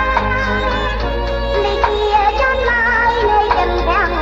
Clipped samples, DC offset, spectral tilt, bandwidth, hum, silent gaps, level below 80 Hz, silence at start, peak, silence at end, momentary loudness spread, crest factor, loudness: under 0.1%; under 0.1%; -5.5 dB/octave; 7.6 kHz; none; none; -24 dBFS; 0 s; 0 dBFS; 0 s; 5 LU; 14 dB; -15 LUFS